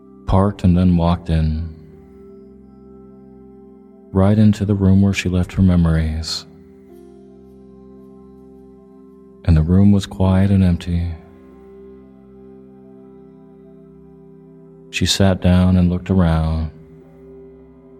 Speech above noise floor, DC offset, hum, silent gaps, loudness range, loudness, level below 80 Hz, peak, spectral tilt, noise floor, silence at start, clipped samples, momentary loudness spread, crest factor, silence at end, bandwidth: 28 dB; under 0.1%; none; none; 10 LU; -16 LUFS; -32 dBFS; 0 dBFS; -7 dB/octave; -43 dBFS; 0.25 s; under 0.1%; 11 LU; 18 dB; 0.5 s; 13.5 kHz